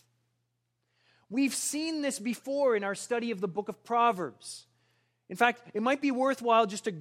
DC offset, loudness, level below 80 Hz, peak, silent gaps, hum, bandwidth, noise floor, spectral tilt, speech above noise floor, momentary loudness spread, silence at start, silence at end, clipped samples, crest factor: under 0.1%; -29 LUFS; -84 dBFS; -10 dBFS; none; none; 16 kHz; -79 dBFS; -3.5 dB/octave; 50 dB; 11 LU; 1.3 s; 0 s; under 0.1%; 22 dB